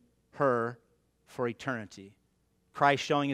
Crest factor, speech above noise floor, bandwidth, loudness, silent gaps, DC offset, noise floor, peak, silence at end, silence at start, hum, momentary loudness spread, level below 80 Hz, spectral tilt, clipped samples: 24 dB; 42 dB; 14 kHz; -30 LUFS; none; under 0.1%; -72 dBFS; -10 dBFS; 0 s; 0.35 s; none; 21 LU; -72 dBFS; -5.5 dB/octave; under 0.1%